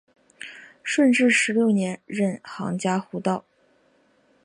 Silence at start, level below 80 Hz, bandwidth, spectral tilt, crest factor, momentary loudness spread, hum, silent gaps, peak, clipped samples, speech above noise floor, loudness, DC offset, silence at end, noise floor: 0.4 s; -72 dBFS; 11 kHz; -5 dB/octave; 16 dB; 21 LU; none; none; -8 dBFS; under 0.1%; 40 dB; -23 LUFS; under 0.1%; 1.05 s; -62 dBFS